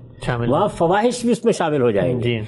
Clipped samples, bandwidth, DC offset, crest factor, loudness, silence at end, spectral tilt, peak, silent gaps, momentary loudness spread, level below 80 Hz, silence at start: under 0.1%; 11.5 kHz; under 0.1%; 12 dB; -19 LUFS; 0 s; -6 dB/octave; -6 dBFS; none; 3 LU; -44 dBFS; 0 s